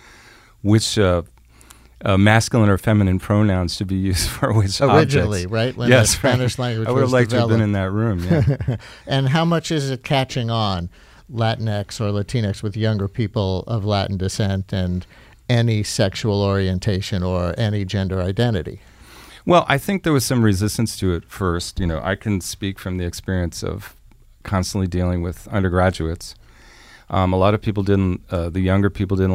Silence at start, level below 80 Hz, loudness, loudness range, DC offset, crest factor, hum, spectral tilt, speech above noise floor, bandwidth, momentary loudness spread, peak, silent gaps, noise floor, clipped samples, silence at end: 0.65 s; -40 dBFS; -20 LUFS; 6 LU; under 0.1%; 18 dB; none; -5.5 dB/octave; 29 dB; 16 kHz; 10 LU; 0 dBFS; none; -47 dBFS; under 0.1%; 0 s